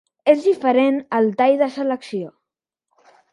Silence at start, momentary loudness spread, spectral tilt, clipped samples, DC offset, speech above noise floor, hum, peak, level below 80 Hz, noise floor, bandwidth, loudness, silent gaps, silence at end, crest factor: 0.25 s; 12 LU; -6.5 dB/octave; under 0.1%; under 0.1%; 66 dB; none; -2 dBFS; -74 dBFS; -84 dBFS; 10.5 kHz; -18 LUFS; none; 1.05 s; 18 dB